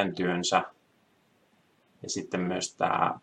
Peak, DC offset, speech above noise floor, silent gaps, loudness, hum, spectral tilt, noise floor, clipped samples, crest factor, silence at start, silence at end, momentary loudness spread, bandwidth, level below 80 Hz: -8 dBFS; under 0.1%; 38 dB; none; -29 LUFS; none; -4 dB/octave; -67 dBFS; under 0.1%; 24 dB; 0 s; 0.05 s; 11 LU; 11 kHz; -74 dBFS